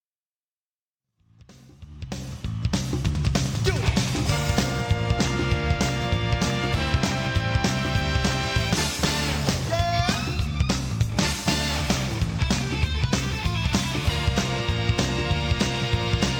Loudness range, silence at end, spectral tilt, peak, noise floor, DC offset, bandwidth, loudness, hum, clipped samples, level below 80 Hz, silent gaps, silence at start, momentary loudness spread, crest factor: 3 LU; 0 s; -4.5 dB/octave; -6 dBFS; under -90 dBFS; under 0.1%; 19.5 kHz; -24 LUFS; none; under 0.1%; -34 dBFS; none; 1.5 s; 3 LU; 18 dB